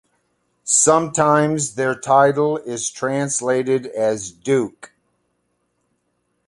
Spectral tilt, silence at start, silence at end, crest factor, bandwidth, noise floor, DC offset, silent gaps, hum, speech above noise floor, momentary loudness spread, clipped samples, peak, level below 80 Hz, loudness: -4 dB/octave; 0.65 s; 1.8 s; 18 dB; 11.5 kHz; -70 dBFS; under 0.1%; none; 60 Hz at -60 dBFS; 52 dB; 9 LU; under 0.1%; -2 dBFS; -60 dBFS; -18 LUFS